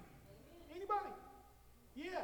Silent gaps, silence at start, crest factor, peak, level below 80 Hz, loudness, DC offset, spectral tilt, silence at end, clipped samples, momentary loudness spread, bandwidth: none; 0 s; 20 dB; -28 dBFS; -68 dBFS; -45 LUFS; under 0.1%; -5 dB/octave; 0 s; under 0.1%; 22 LU; 19.5 kHz